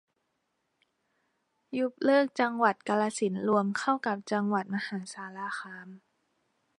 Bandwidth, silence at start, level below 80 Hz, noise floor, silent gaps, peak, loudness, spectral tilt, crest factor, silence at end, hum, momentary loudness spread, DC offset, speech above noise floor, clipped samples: 11 kHz; 1.7 s; -82 dBFS; -79 dBFS; none; -10 dBFS; -29 LUFS; -5.5 dB/octave; 22 dB; 0.8 s; none; 13 LU; under 0.1%; 50 dB; under 0.1%